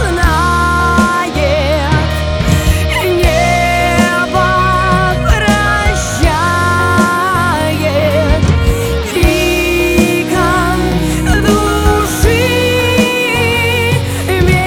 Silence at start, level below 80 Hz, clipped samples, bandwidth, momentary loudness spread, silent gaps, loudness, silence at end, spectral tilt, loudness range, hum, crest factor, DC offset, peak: 0 s; -18 dBFS; under 0.1%; 19.5 kHz; 3 LU; none; -11 LUFS; 0 s; -5 dB/octave; 1 LU; none; 10 dB; under 0.1%; 0 dBFS